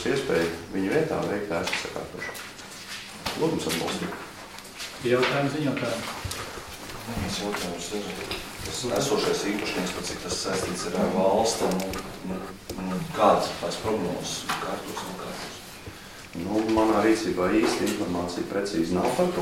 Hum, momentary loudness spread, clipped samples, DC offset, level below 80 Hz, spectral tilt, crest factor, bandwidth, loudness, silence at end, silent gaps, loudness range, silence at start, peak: none; 14 LU; under 0.1%; under 0.1%; -50 dBFS; -4.5 dB/octave; 22 dB; 16.5 kHz; -27 LUFS; 0 s; none; 5 LU; 0 s; -6 dBFS